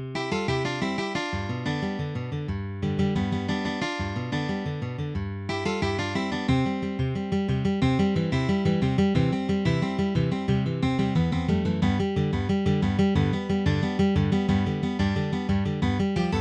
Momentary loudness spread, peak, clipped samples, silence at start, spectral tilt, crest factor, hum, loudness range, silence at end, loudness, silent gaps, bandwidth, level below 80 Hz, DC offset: 7 LU; -10 dBFS; under 0.1%; 0 s; -7 dB/octave; 16 dB; none; 4 LU; 0 s; -26 LUFS; none; 9.2 kHz; -42 dBFS; under 0.1%